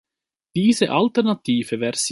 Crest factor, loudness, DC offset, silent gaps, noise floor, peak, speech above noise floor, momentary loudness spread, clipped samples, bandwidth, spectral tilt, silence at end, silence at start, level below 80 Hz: 18 dB; -20 LUFS; under 0.1%; none; -84 dBFS; -2 dBFS; 64 dB; 5 LU; under 0.1%; 11.5 kHz; -4.5 dB/octave; 0 s; 0.55 s; -64 dBFS